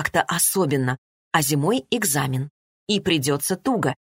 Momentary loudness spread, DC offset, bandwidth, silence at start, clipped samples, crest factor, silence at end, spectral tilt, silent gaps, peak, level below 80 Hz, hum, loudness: 9 LU; under 0.1%; 16.5 kHz; 0 s; under 0.1%; 20 dB; 0.2 s; -4 dB/octave; 0.98-1.31 s, 2.50-2.87 s; -4 dBFS; -56 dBFS; none; -22 LUFS